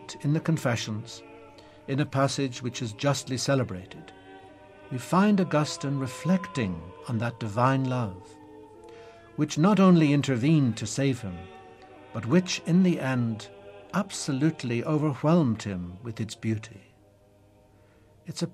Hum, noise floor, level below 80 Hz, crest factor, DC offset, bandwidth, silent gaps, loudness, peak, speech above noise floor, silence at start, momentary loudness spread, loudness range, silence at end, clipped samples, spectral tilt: none; -58 dBFS; -62 dBFS; 18 dB; under 0.1%; 13.5 kHz; none; -26 LUFS; -8 dBFS; 32 dB; 0 s; 17 LU; 5 LU; 0.05 s; under 0.1%; -6 dB/octave